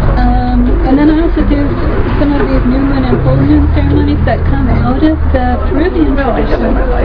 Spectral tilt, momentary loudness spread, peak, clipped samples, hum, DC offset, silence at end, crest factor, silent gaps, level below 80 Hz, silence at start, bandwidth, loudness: -10.5 dB/octave; 4 LU; 0 dBFS; 0.3%; none; under 0.1%; 0 s; 8 dB; none; -14 dBFS; 0 s; 5.2 kHz; -11 LUFS